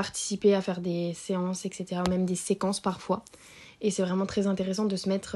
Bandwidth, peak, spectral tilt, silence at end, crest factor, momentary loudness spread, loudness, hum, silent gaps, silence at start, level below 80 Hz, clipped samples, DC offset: 12 kHz; -12 dBFS; -5.5 dB/octave; 0 s; 18 dB; 8 LU; -29 LUFS; none; none; 0 s; -58 dBFS; under 0.1%; under 0.1%